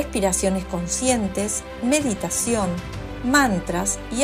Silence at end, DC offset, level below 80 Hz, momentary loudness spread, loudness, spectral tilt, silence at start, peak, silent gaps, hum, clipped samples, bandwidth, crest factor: 0 s; under 0.1%; -38 dBFS; 8 LU; -22 LUFS; -3.5 dB/octave; 0 s; -4 dBFS; none; none; under 0.1%; 14.5 kHz; 20 dB